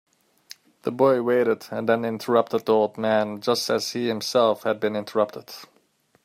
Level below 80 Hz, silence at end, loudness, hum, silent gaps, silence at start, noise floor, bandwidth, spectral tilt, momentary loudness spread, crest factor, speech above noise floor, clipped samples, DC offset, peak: -72 dBFS; 0.6 s; -23 LUFS; none; none; 0.85 s; -64 dBFS; 16 kHz; -4.5 dB/octave; 7 LU; 18 dB; 41 dB; under 0.1%; under 0.1%; -6 dBFS